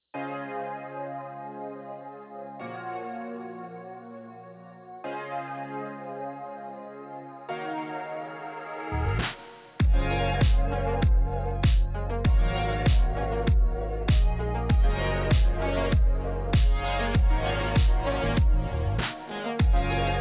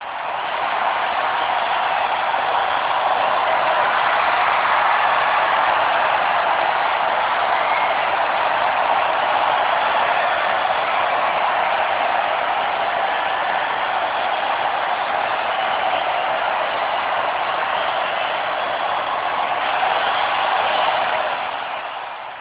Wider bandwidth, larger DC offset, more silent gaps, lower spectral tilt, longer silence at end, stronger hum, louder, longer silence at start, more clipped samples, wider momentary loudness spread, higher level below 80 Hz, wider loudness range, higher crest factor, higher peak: about the same, 4 kHz vs 4 kHz; neither; neither; first, -10.5 dB/octave vs -5.5 dB/octave; about the same, 0 s vs 0 s; neither; second, -28 LUFS vs -19 LUFS; first, 0.15 s vs 0 s; neither; first, 16 LU vs 4 LU; first, -28 dBFS vs -58 dBFS; first, 12 LU vs 3 LU; about the same, 14 dB vs 14 dB; second, -12 dBFS vs -6 dBFS